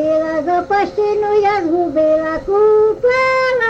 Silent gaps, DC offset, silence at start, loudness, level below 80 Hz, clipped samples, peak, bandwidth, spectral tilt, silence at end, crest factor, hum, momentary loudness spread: none; under 0.1%; 0 s; -15 LUFS; -44 dBFS; under 0.1%; -4 dBFS; 7.8 kHz; -5.5 dB/octave; 0 s; 10 dB; none; 5 LU